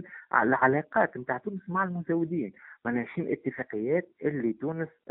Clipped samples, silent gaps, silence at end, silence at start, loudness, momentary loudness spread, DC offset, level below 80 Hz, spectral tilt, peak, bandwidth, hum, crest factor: under 0.1%; none; 0.2 s; 0 s; -29 LUFS; 10 LU; under 0.1%; -70 dBFS; -2 dB/octave; -6 dBFS; 3.9 kHz; none; 22 dB